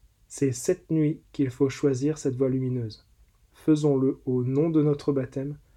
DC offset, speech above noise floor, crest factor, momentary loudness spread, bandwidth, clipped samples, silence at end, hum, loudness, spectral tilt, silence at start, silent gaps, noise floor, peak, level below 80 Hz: under 0.1%; 34 dB; 16 dB; 9 LU; 13.5 kHz; under 0.1%; 0.2 s; none; -26 LUFS; -7.5 dB/octave; 0.3 s; none; -59 dBFS; -10 dBFS; -58 dBFS